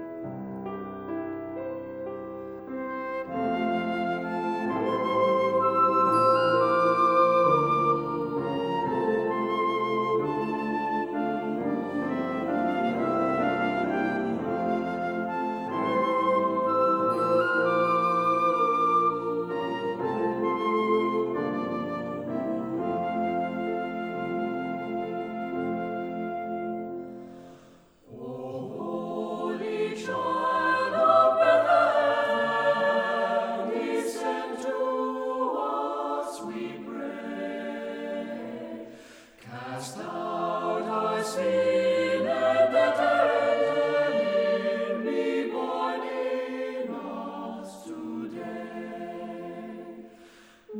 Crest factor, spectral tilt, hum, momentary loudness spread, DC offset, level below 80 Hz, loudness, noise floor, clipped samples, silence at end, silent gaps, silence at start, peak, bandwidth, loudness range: 18 dB; -6 dB/octave; none; 14 LU; under 0.1%; -68 dBFS; -27 LUFS; -55 dBFS; under 0.1%; 0 s; none; 0 s; -8 dBFS; 13.5 kHz; 12 LU